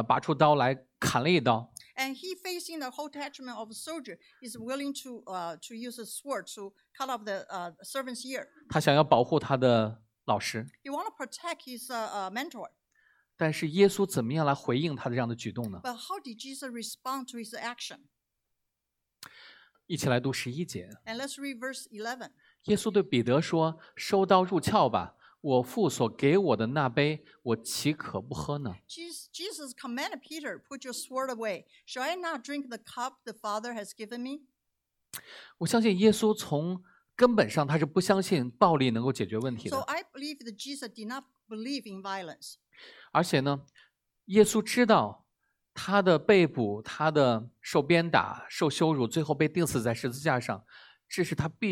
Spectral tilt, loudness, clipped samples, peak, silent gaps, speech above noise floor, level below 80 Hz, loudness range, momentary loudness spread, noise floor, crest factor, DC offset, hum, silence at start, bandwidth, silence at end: -5 dB/octave; -29 LUFS; under 0.1%; -6 dBFS; none; 56 dB; -66 dBFS; 12 LU; 16 LU; -85 dBFS; 24 dB; under 0.1%; none; 0 s; 18.5 kHz; 0 s